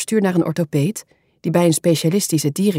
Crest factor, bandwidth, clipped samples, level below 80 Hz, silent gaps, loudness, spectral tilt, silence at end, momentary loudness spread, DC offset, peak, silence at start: 14 dB; 16.5 kHz; under 0.1%; -64 dBFS; none; -18 LUFS; -5.5 dB/octave; 0 s; 7 LU; under 0.1%; -4 dBFS; 0 s